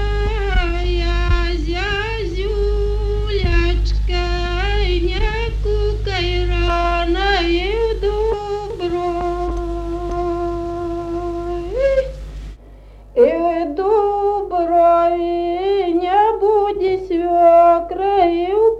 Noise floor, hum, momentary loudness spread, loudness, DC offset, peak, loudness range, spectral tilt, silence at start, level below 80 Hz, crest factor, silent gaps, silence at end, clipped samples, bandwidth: -40 dBFS; none; 10 LU; -18 LUFS; under 0.1%; -2 dBFS; 7 LU; -7 dB/octave; 0 s; -22 dBFS; 16 dB; none; 0 s; under 0.1%; 7.8 kHz